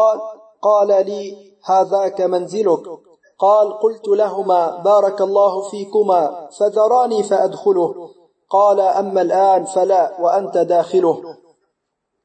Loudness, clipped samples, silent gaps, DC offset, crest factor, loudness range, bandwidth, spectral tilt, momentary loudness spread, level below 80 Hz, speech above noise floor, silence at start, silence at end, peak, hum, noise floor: -16 LUFS; under 0.1%; none; under 0.1%; 14 dB; 2 LU; 8.8 kHz; -5.5 dB/octave; 9 LU; -80 dBFS; 59 dB; 0 s; 0.9 s; -4 dBFS; none; -75 dBFS